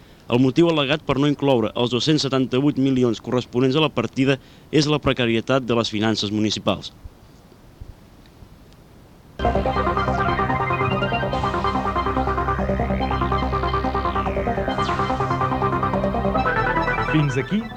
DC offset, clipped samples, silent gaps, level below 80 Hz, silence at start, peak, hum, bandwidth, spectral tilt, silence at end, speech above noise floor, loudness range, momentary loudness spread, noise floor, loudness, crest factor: under 0.1%; under 0.1%; none; -34 dBFS; 0.25 s; -4 dBFS; none; 9.8 kHz; -6 dB/octave; 0 s; 27 dB; 6 LU; 4 LU; -47 dBFS; -21 LUFS; 18 dB